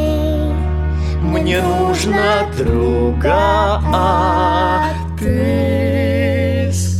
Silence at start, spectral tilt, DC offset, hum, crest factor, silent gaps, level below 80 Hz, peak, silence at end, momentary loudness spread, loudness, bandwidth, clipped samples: 0 s; -6 dB/octave; 0.7%; none; 12 dB; none; -22 dBFS; -2 dBFS; 0 s; 5 LU; -16 LUFS; 14 kHz; under 0.1%